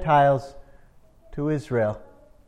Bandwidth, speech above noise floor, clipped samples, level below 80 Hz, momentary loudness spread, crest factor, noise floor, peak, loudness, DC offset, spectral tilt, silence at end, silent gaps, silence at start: 10.5 kHz; 31 dB; under 0.1%; -48 dBFS; 21 LU; 16 dB; -52 dBFS; -8 dBFS; -24 LUFS; under 0.1%; -8 dB/octave; 0.45 s; none; 0 s